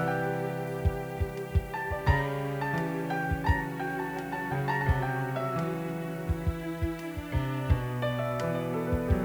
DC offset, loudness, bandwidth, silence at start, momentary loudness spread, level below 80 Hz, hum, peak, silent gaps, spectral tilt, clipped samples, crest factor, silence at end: under 0.1%; -31 LUFS; over 20 kHz; 0 s; 6 LU; -38 dBFS; none; -10 dBFS; none; -7.5 dB/octave; under 0.1%; 20 dB; 0 s